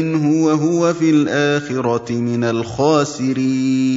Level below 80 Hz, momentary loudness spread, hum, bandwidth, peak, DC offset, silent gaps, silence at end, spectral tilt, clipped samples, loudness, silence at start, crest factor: -56 dBFS; 5 LU; none; 7.8 kHz; -2 dBFS; under 0.1%; none; 0 s; -6 dB/octave; under 0.1%; -17 LUFS; 0 s; 14 dB